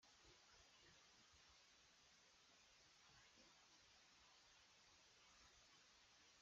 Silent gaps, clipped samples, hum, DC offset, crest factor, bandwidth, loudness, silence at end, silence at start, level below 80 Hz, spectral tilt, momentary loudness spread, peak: none; under 0.1%; none; under 0.1%; 14 dB; 7.6 kHz; -70 LUFS; 0 s; 0 s; -88 dBFS; -0.5 dB/octave; 1 LU; -58 dBFS